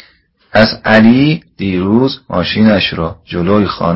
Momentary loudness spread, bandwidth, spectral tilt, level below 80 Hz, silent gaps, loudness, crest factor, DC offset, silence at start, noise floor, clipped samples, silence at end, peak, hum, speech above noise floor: 10 LU; 5.8 kHz; -8 dB/octave; -36 dBFS; none; -12 LUFS; 12 dB; under 0.1%; 0.55 s; -49 dBFS; 0.2%; 0 s; 0 dBFS; none; 38 dB